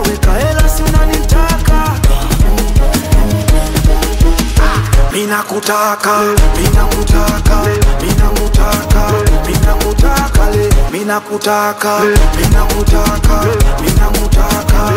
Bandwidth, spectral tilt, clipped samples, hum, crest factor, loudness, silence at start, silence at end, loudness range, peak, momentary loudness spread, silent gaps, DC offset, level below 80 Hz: 16.5 kHz; -5 dB/octave; under 0.1%; none; 10 dB; -12 LUFS; 0 s; 0 s; 1 LU; 0 dBFS; 2 LU; none; under 0.1%; -12 dBFS